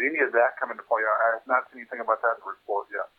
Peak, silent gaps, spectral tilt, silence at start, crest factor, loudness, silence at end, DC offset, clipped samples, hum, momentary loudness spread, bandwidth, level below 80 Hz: -8 dBFS; none; -6 dB/octave; 0 s; 18 dB; -26 LUFS; 0.15 s; under 0.1%; under 0.1%; none; 11 LU; 4.4 kHz; -80 dBFS